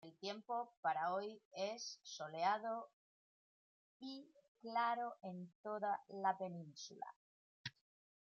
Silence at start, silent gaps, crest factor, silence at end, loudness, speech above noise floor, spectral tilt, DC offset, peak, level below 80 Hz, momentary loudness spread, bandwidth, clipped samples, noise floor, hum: 0.05 s; 0.77-0.83 s, 1.45-1.51 s, 2.93-4.00 s, 4.48-4.55 s, 5.55-5.64 s, 7.16-7.64 s; 20 dB; 0.6 s; -44 LUFS; over 46 dB; -2.5 dB/octave; under 0.1%; -26 dBFS; under -90 dBFS; 14 LU; 7.4 kHz; under 0.1%; under -90 dBFS; none